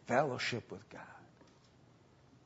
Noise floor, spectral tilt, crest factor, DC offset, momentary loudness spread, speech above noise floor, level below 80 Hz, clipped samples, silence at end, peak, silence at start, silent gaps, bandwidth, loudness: -64 dBFS; -3.5 dB/octave; 24 dB; under 0.1%; 22 LU; 27 dB; -76 dBFS; under 0.1%; 1.2 s; -16 dBFS; 0.05 s; none; 7.6 kHz; -37 LUFS